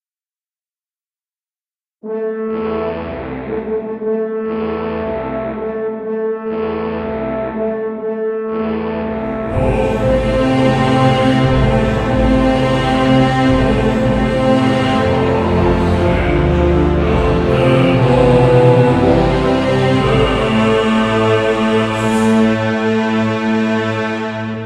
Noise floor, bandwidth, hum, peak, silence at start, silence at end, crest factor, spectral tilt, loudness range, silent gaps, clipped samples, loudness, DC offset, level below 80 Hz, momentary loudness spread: under -90 dBFS; 11 kHz; none; 0 dBFS; 2.05 s; 0 s; 14 dB; -7.5 dB/octave; 9 LU; none; under 0.1%; -15 LUFS; under 0.1%; -26 dBFS; 9 LU